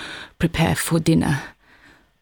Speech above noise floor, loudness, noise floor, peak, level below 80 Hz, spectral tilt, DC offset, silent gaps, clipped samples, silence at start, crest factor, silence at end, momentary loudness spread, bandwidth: 33 dB; -20 LUFS; -52 dBFS; -6 dBFS; -40 dBFS; -5.5 dB/octave; under 0.1%; none; under 0.1%; 0 s; 16 dB; 0.7 s; 13 LU; 19 kHz